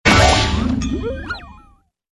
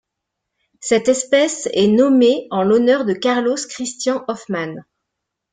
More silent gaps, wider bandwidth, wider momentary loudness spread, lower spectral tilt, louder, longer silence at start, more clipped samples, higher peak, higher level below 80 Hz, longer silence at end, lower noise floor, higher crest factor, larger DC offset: neither; first, 12 kHz vs 9.6 kHz; first, 17 LU vs 12 LU; about the same, -4.5 dB/octave vs -4 dB/octave; about the same, -17 LUFS vs -17 LUFS; second, 0.05 s vs 0.8 s; neither; about the same, -2 dBFS vs -2 dBFS; first, -26 dBFS vs -62 dBFS; about the same, 0.6 s vs 0.7 s; second, -52 dBFS vs -79 dBFS; about the same, 16 dB vs 16 dB; neither